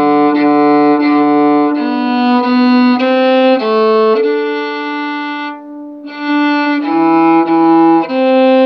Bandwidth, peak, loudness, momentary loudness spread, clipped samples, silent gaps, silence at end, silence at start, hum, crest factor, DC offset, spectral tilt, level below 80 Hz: 6 kHz; 0 dBFS; -11 LUFS; 10 LU; under 0.1%; none; 0 s; 0 s; none; 10 dB; under 0.1%; -7 dB/octave; -70 dBFS